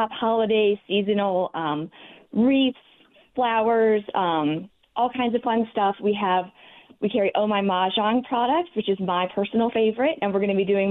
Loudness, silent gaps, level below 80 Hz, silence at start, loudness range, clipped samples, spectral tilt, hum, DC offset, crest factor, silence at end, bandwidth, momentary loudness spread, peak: -23 LUFS; none; -64 dBFS; 0 s; 1 LU; under 0.1%; -9.5 dB/octave; none; under 0.1%; 10 dB; 0 s; 4.1 kHz; 7 LU; -12 dBFS